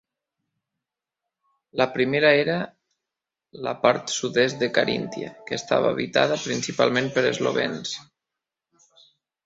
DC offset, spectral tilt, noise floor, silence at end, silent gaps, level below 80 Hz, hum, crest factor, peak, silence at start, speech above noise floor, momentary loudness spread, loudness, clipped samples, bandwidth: under 0.1%; -4 dB/octave; -87 dBFS; 1.45 s; none; -64 dBFS; none; 22 dB; -4 dBFS; 1.75 s; 64 dB; 13 LU; -23 LUFS; under 0.1%; 8 kHz